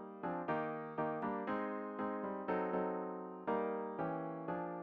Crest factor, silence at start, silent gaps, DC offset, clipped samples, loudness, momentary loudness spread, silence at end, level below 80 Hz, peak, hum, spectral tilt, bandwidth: 16 dB; 0 s; none; under 0.1%; under 0.1%; -41 LUFS; 4 LU; 0 s; -76 dBFS; -24 dBFS; none; -6.5 dB/octave; 5.4 kHz